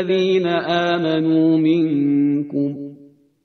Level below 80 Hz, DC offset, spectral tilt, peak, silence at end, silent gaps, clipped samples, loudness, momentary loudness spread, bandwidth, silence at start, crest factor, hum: -64 dBFS; under 0.1%; -7.5 dB/octave; -4 dBFS; 0.5 s; none; under 0.1%; -18 LUFS; 8 LU; 6.4 kHz; 0 s; 14 dB; none